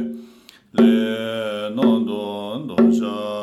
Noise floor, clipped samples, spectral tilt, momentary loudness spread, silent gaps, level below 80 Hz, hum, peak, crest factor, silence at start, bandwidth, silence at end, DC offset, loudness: -48 dBFS; under 0.1%; -6.5 dB/octave; 12 LU; none; -66 dBFS; none; -4 dBFS; 16 dB; 0 s; 12 kHz; 0 s; under 0.1%; -20 LUFS